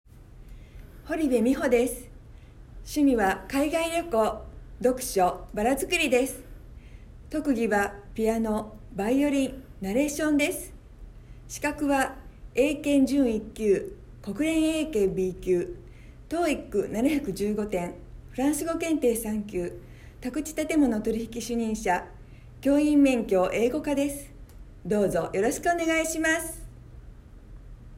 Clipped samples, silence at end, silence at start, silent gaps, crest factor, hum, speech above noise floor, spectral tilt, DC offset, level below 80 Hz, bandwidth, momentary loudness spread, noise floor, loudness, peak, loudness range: under 0.1%; 0 s; 0.15 s; none; 16 dB; none; 22 dB; -4.5 dB/octave; under 0.1%; -46 dBFS; 16 kHz; 14 LU; -47 dBFS; -26 LUFS; -10 dBFS; 3 LU